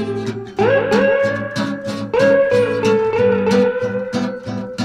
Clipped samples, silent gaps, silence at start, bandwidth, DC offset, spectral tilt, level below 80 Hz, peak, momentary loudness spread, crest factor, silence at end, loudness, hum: under 0.1%; none; 0 s; 11.5 kHz; under 0.1%; -6 dB/octave; -52 dBFS; -2 dBFS; 10 LU; 14 dB; 0 s; -17 LUFS; none